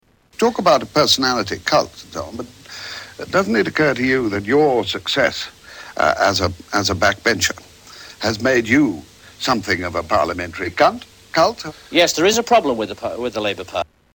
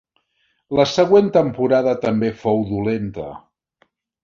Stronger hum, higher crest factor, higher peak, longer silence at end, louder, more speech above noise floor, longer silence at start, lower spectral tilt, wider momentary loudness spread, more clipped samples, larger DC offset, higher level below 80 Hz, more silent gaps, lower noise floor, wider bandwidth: neither; about the same, 16 dB vs 18 dB; about the same, -2 dBFS vs -2 dBFS; second, 0.3 s vs 0.85 s; about the same, -18 LUFS vs -18 LUFS; second, 23 dB vs 50 dB; second, 0.4 s vs 0.7 s; second, -3.5 dB/octave vs -6.5 dB/octave; first, 16 LU vs 12 LU; neither; neither; about the same, -48 dBFS vs -50 dBFS; neither; second, -41 dBFS vs -67 dBFS; first, 19 kHz vs 7.4 kHz